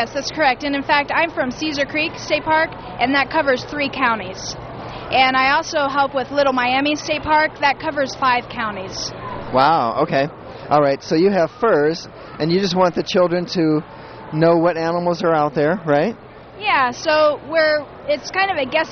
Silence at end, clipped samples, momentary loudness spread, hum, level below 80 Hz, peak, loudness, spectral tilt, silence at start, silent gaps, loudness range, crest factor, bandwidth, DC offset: 0 s; under 0.1%; 9 LU; none; -48 dBFS; 0 dBFS; -18 LUFS; -5 dB/octave; 0 s; none; 2 LU; 18 dB; 6.8 kHz; under 0.1%